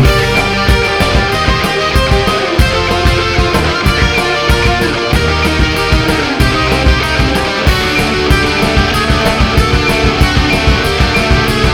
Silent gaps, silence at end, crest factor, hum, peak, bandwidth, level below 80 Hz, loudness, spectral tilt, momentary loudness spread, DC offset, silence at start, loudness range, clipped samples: none; 0 s; 10 dB; none; 0 dBFS; 17.5 kHz; -16 dBFS; -11 LUFS; -5 dB/octave; 1 LU; under 0.1%; 0 s; 1 LU; 0.1%